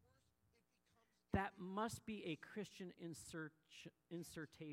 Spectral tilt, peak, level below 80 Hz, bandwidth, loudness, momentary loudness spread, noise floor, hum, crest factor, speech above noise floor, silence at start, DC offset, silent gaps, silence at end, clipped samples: -5 dB/octave; -28 dBFS; -68 dBFS; 16 kHz; -50 LUFS; 11 LU; -82 dBFS; none; 24 dB; 31 dB; 1.3 s; under 0.1%; none; 0 s; under 0.1%